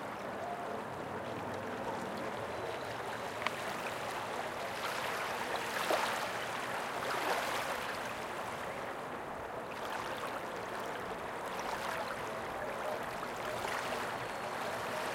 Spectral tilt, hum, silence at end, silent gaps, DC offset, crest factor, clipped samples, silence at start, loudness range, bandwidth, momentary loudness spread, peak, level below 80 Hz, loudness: -3 dB/octave; none; 0 s; none; under 0.1%; 24 dB; under 0.1%; 0 s; 4 LU; 17 kHz; 6 LU; -14 dBFS; -66 dBFS; -38 LUFS